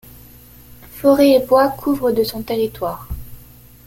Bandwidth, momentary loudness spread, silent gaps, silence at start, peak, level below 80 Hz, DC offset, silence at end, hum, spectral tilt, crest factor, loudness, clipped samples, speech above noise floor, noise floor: 17 kHz; 20 LU; none; 0.7 s; -2 dBFS; -40 dBFS; under 0.1%; 0.45 s; none; -5.5 dB/octave; 16 dB; -16 LUFS; under 0.1%; 27 dB; -43 dBFS